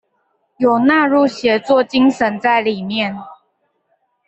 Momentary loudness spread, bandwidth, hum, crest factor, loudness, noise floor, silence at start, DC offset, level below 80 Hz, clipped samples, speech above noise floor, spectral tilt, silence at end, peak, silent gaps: 8 LU; 8.2 kHz; none; 14 dB; -15 LUFS; -65 dBFS; 0.6 s; under 0.1%; -58 dBFS; under 0.1%; 51 dB; -5.5 dB/octave; 0.95 s; -2 dBFS; none